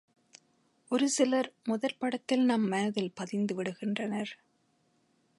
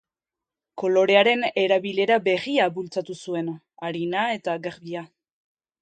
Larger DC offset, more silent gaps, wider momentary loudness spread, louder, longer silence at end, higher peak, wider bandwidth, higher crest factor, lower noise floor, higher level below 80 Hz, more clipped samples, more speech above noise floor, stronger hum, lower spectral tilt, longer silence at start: neither; neither; second, 8 LU vs 16 LU; second, -31 LUFS vs -23 LUFS; first, 1.05 s vs 0.75 s; second, -14 dBFS vs -2 dBFS; first, 11.5 kHz vs 9 kHz; about the same, 18 dB vs 22 dB; second, -72 dBFS vs -89 dBFS; second, -82 dBFS vs -74 dBFS; neither; second, 42 dB vs 66 dB; neither; about the same, -4.5 dB/octave vs -5 dB/octave; first, 0.9 s vs 0.75 s